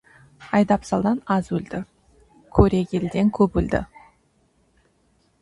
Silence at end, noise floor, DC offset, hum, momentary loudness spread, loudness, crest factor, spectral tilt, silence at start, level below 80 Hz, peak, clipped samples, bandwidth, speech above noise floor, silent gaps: 1.55 s; -63 dBFS; under 0.1%; none; 13 LU; -22 LUFS; 22 dB; -8 dB/octave; 0.4 s; -38 dBFS; -2 dBFS; under 0.1%; 11 kHz; 43 dB; none